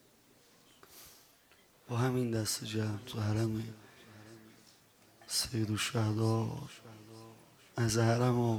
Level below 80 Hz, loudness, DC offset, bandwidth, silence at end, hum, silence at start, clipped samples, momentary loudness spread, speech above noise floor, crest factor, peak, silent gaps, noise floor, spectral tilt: -64 dBFS; -34 LUFS; under 0.1%; 17.5 kHz; 0 s; none; 0.9 s; under 0.1%; 25 LU; 32 dB; 20 dB; -16 dBFS; none; -64 dBFS; -5 dB/octave